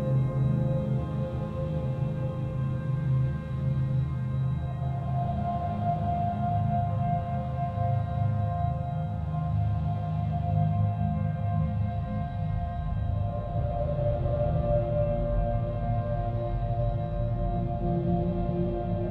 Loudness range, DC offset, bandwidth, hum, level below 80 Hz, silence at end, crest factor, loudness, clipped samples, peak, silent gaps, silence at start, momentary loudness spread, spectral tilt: 1 LU; under 0.1%; 4.3 kHz; none; -38 dBFS; 0 s; 16 dB; -29 LUFS; under 0.1%; -12 dBFS; none; 0 s; 5 LU; -11 dB/octave